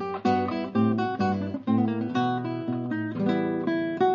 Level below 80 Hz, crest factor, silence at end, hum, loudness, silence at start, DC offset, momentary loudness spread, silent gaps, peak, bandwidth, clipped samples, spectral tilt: -68 dBFS; 14 dB; 0 s; none; -27 LUFS; 0 s; under 0.1%; 5 LU; none; -12 dBFS; 7.2 kHz; under 0.1%; -8 dB/octave